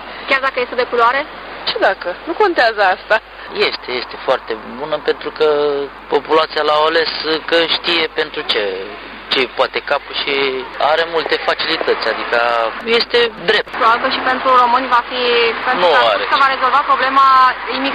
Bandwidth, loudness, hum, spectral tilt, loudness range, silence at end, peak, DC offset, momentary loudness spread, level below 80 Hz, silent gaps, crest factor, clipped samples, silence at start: 10.5 kHz; -15 LUFS; none; -3.5 dB/octave; 4 LU; 0 s; 0 dBFS; under 0.1%; 9 LU; -50 dBFS; none; 16 dB; under 0.1%; 0 s